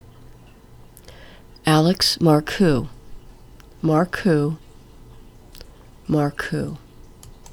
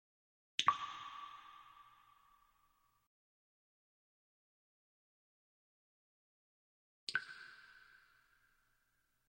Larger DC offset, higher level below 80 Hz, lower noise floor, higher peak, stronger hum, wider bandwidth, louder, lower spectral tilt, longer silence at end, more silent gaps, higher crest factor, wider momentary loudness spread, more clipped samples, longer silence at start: neither; first, -44 dBFS vs -86 dBFS; second, -46 dBFS vs -81 dBFS; first, -2 dBFS vs -16 dBFS; second, none vs 60 Hz at -105 dBFS; first, 18.5 kHz vs 16 kHz; first, -20 LUFS vs -41 LUFS; first, -5.5 dB/octave vs 0 dB/octave; second, 0 s vs 1.35 s; second, none vs 3.07-7.07 s; second, 20 dB vs 34 dB; second, 16 LU vs 26 LU; neither; second, 0.25 s vs 0.6 s